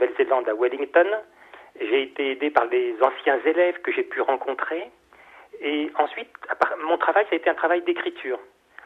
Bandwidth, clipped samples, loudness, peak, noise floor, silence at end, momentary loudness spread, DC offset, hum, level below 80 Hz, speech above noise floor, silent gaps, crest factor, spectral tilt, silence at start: 5.8 kHz; under 0.1%; -23 LUFS; -4 dBFS; -50 dBFS; 0.4 s; 11 LU; under 0.1%; none; -72 dBFS; 27 dB; none; 20 dB; -4.5 dB/octave; 0 s